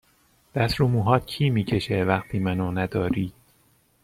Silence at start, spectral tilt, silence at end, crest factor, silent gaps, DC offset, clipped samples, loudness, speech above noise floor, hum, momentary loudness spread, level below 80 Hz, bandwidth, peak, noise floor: 0.55 s; -7.5 dB/octave; 0.75 s; 20 dB; none; under 0.1%; under 0.1%; -24 LUFS; 39 dB; none; 5 LU; -48 dBFS; 15 kHz; -4 dBFS; -62 dBFS